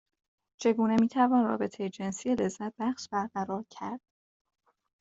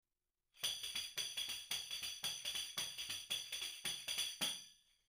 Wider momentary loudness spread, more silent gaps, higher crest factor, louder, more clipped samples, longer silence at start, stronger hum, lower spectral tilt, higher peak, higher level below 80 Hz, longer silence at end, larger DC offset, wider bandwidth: first, 13 LU vs 4 LU; neither; about the same, 18 dB vs 20 dB; first, -30 LUFS vs -42 LUFS; neither; about the same, 0.6 s vs 0.55 s; neither; first, -6 dB/octave vs 1 dB/octave; first, -12 dBFS vs -26 dBFS; first, -68 dBFS vs -78 dBFS; first, 1 s vs 0.35 s; neither; second, 8 kHz vs 15.5 kHz